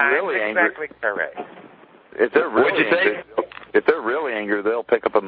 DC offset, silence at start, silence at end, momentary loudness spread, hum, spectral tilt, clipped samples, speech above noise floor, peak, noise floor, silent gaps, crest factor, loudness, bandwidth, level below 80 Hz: under 0.1%; 0 s; 0 s; 10 LU; none; -8 dB/octave; under 0.1%; 27 dB; -2 dBFS; -47 dBFS; none; 18 dB; -20 LUFS; 5 kHz; -66 dBFS